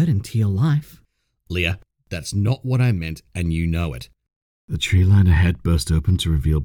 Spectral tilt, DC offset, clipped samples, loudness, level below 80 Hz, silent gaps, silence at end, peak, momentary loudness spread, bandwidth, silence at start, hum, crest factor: -6 dB/octave; under 0.1%; under 0.1%; -20 LUFS; -32 dBFS; 4.36-4.68 s; 0 s; -6 dBFS; 14 LU; 16 kHz; 0 s; none; 14 dB